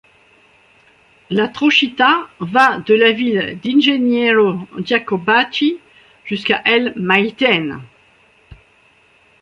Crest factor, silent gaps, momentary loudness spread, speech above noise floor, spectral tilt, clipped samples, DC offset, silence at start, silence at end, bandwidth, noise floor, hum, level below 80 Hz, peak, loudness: 16 dB; none; 9 LU; 38 dB; -5.5 dB/octave; under 0.1%; under 0.1%; 1.3 s; 0.9 s; 10.5 kHz; -53 dBFS; none; -58 dBFS; 0 dBFS; -15 LUFS